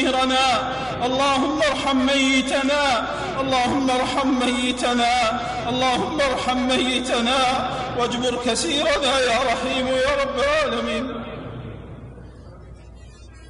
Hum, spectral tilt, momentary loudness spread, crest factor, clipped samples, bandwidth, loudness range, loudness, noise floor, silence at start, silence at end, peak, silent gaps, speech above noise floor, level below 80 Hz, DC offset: none; -3.5 dB/octave; 7 LU; 14 dB; under 0.1%; 11 kHz; 4 LU; -20 LUFS; -42 dBFS; 0 s; 0 s; -8 dBFS; none; 21 dB; -42 dBFS; under 0.1%